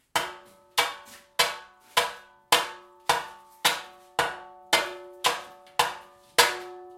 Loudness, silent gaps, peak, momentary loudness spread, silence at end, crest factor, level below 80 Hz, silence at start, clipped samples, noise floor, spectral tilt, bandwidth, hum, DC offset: -27 LUFS; none; -2 dBFS; 13 LU; 0 s; 28 dB; -66 dBFS; 0.15 s; under 0.1%; -46 dBFS; 0 dB/octave; 16.5 kHz; none; under 0.1%